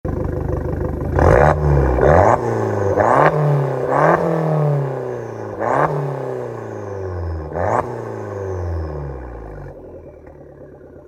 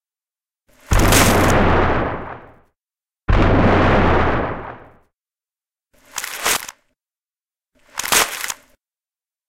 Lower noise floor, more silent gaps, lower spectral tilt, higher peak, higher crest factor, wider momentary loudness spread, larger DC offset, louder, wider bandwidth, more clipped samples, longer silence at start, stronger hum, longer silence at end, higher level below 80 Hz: second, -39 dBFS vs under -90 dBFS; neither; first, -8.5 dB/octave vs -4 dB/octave; about the same, 0 dBFS vs 0 dBFS; about the same, 18 dB vs 20 dB; about the same, 16 LU vs 18 LU; neither; about the same, -18 LUFS vs -17 LUFS; second, 9.6 kHz vs 17 kHz; neither; second, 0.05 s vs 0.9 s; neither; second, 0.05 s vs 0.95 s; about the same, -30 dBFS vs -26 dBFS